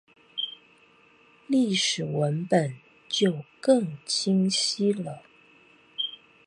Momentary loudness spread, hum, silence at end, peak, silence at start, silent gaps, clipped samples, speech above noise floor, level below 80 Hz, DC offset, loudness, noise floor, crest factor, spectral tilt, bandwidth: 11 LU; none; 0.3 s; -8 dBFS; 0.35 s; none; under 0.1%; 33 dB; -72 dBFS; under 0.1%; -26 LUFS; -58 dBFS; 20 dB; -4.5 dB/octave; 11.5 kHz